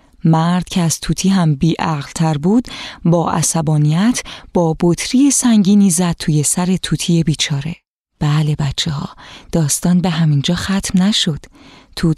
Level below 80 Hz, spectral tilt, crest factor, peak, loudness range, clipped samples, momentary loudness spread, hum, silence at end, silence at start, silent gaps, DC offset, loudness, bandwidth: -40 dBFS; -5 dB/octave; 14 dB; -2 dBFS; 4 LU; under 0.1%; 9 LU; none; 0.05 s; 0.25 s; 7.87-8.05 s; under 0.1%; -15 LUFS; 14 kHz